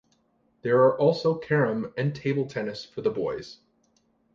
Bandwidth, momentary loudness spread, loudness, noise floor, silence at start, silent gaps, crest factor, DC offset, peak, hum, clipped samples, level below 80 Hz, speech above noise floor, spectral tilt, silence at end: 7.4 kHz; 13 LU; -26 LUFS; -68 dBFS; 0.65 s; none; 18 dB; under 0.1%; -8 dBFS; none; under 0.1%; -64 dBFS; 43 dB; -7.5 dB/octave; 0.8 s